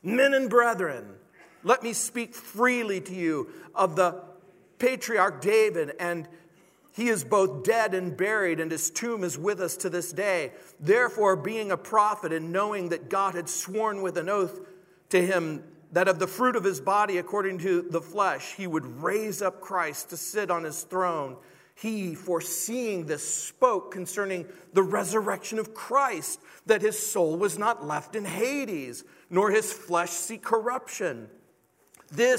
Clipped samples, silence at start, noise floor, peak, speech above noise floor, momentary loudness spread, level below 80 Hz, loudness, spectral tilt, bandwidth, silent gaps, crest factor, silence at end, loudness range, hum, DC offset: under 0.1%; 0.05 s; -64 dBFS; -6 dBFS; 38 dB; 10 LU; -80 dBFS; -27 LUFS; -4 dB/octave; 16 kHz; none; 22 dB; 0 s; 3 LU; none; under 0.1%